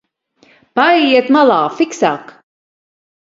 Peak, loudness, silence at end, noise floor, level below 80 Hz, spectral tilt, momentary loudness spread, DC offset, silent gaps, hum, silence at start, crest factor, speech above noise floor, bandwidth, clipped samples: 0 dBFS; -12 LUFS; 1.1 s; -53 dBFS; -64 dBFS; -4 dB/octave; 9 LU; under 0.1%; none; none; 0.75 s; 14 dB; 41 dB; 7.8 kHz; under 0.1%